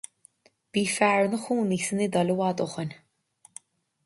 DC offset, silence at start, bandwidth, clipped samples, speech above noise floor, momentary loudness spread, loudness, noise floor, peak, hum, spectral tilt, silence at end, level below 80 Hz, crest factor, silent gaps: under 0.1%; 0.75 s; 11.5 kHz; under 0.1%; 36 dB; 24 LU; -26 LUFS; -61 dBFS; -8 dBFS; none; -5 dB/octave; 1.1 s; -70 dBFS; 20 dB; none